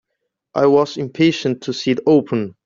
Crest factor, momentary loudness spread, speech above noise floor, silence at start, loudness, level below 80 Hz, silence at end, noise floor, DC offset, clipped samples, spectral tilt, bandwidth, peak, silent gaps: 14 dB; 8 LU; 59 dB; 0.55 s; -17 LUFS; -60 dBFS; 0.15 s; -76 dBFS; under 0.1%; under 0.1%; -6 dB/octave; 7.6 kHz; -2 dBFS; none